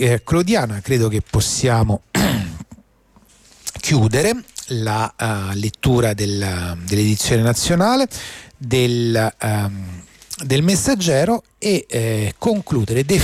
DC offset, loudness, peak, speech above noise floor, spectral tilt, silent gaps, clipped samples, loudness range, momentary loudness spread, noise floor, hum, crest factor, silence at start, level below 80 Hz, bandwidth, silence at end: under 0.1%; -18 LUFS; -6 dBFS; 35 dB; -5 dB/octave; none; under 0.1%; 3 LU; 10 LU; -53 dBFS; none; 12 dB; 0 s; -38 dBFS; 16 kHz; 0 s